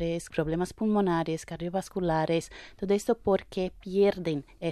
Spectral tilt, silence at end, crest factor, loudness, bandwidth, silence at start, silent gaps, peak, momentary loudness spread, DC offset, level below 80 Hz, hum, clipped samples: -6.5 dB/octave; 0 s; 16 dB; -29 LUFS; 13.5 kHz; 0 s; none; -12 dBFS; 8 LU; under 0.1%; -52 dBFS; none; under 0.1%